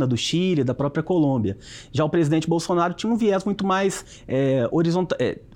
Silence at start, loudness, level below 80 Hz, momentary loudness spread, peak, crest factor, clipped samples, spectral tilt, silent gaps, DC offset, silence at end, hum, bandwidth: 0 s; -22 LUFS; -54 dBFS; 5 LU; -10 dBFS; 12 dB; under 0.1%; -6 dB/octave; none; under 0.1%; 0 s; none; 15 kHz